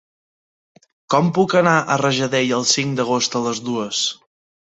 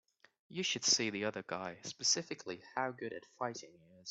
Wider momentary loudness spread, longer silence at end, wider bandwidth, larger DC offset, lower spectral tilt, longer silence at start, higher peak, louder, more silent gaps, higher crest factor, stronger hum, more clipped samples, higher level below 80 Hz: second, 7 LU vs 15 LU; first, 0.55 s vs 0 s; about the same, 8.4 kHz vs 8.4 kHz; neither; first, -3.5 dB/octave vs -1.5 dB/octave; first, 1.1 s vs 0.5 s; first, -2 dBFS vs -16 dBFS; first, -18 LUFS vs -36 LUFS; neither; second, 18 dB vs 24 dB; neither; neither; first, -62 dBFS vs -82 dBFS